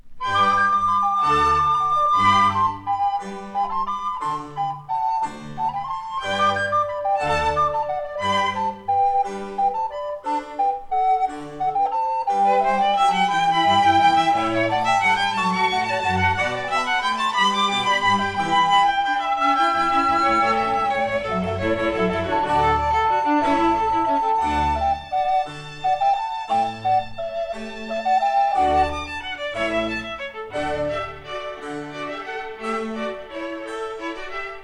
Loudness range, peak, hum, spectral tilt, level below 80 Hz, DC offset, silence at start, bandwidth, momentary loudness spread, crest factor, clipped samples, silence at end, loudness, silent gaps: 7 LU; -6 dBFS; none; -4.5 dB/octave; -44 dBFS; 0.2%; 0.05 s; 11 kHz; 12 LU; 16 dB; under 0.1%; 0 s; -21 LUFS; none